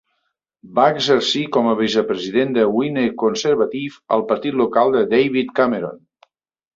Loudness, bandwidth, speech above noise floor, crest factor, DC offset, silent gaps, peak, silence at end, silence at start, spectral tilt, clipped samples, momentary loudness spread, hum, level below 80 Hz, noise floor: -18 LUFS; 7.8 kHz; 55 dB; 16 dB; under 0.1%; none; -2 dBFS; 0.8 s; 0.65 s; -5 dB/octave; under 0.1%; 5 LU; none; -60 dBFS; -73 dBFS